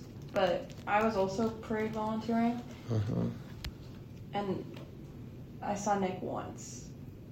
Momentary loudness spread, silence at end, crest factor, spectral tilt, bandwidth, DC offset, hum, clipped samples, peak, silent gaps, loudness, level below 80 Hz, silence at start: 17 LU; 0 s; 18 dB; -6 dB/octave; 16 kHz; under 0.1%; none; under 0.1%; -18 dBFS; none; -35 LUFS; -56 dBFS; 0 s